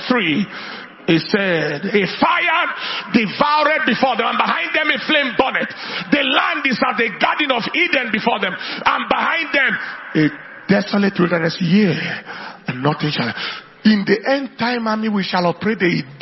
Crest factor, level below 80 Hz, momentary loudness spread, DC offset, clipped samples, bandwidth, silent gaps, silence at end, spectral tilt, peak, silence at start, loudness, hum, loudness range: 18 dB; -58 dBFS; 7 LU; under 0.1%; under 0.1%; 6 kHz; none; 0.05 s; -6.5 dB/octave; 0 dBFS; 0 s; -17 LUFS; none; 2 LU